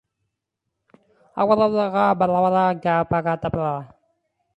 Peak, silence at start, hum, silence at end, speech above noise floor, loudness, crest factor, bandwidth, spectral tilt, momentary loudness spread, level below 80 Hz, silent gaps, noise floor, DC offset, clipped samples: -4 dBFS; 1.35 s; none; 0.7 s; 61 dB; -20 LUFS; 18 dB; 10.5 kHz; -8.5 dB/octave; 8 LU; -54 dBFS; none; -80 dBFS; under 0.1%; under 0.1%